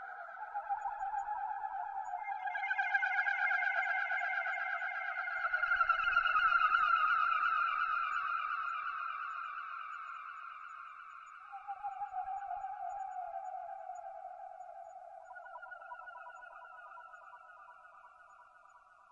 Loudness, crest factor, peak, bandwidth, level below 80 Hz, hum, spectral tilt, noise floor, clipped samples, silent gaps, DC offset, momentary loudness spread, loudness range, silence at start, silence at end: -35 LUFS; 20 dB; -18 dBFS; 7.4 kHz; -72 dBFS; none; -0.5 dB/octave; -62 dBFS; under 0.1%; none; under 0.1%; 21 LU; 20 LU; 0 s; 0.35 s